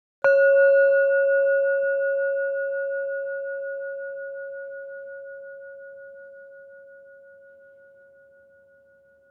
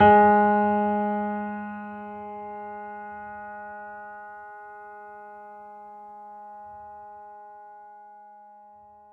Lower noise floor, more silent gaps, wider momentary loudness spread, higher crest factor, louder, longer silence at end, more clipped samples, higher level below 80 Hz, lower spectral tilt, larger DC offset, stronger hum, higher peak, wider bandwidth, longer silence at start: first, -57 dBFS vs -51 dBFS; neither; about the same, 25 LU vs 24 LU; second, 16 dB vs 22 dB; first, -22 LUFS vs -25 LUFS; first, 2.35 s vs 1.7 s; neither; second, -84 dBFS vs -64 dBFS; second, -4 dB/octave vs -9.5 dB/octave; neither; neither; second, -10 dBFS vs -6 dBFS; about the same, 4.4 kHz vs 4.1 kHz; first, 0.25 s vs 0 s